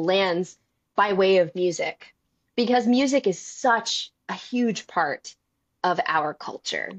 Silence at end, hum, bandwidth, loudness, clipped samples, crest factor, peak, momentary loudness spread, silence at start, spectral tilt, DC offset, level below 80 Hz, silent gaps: 0 s; none; 8.6 kHz; -24 LUFS; under 0.1%; 16 dB; -8 dBFS; 12 LU; 0 s; -4 dB/octave; under 0.1%; -70 dBFS; none